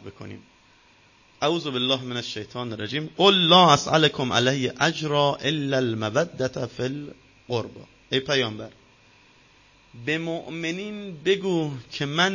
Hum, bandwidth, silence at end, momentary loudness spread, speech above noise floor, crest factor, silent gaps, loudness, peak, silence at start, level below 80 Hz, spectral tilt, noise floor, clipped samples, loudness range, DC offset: none; 7.4 kHz; 0 s; 15 LU; 33 dB; 24 dB; none; -23 LUFS; 0 dBFS; 0.05 s; -60 dBFS; -4.5 dB/octave; -57 dBFS; under 0.1%; 10 LU; under 0.1%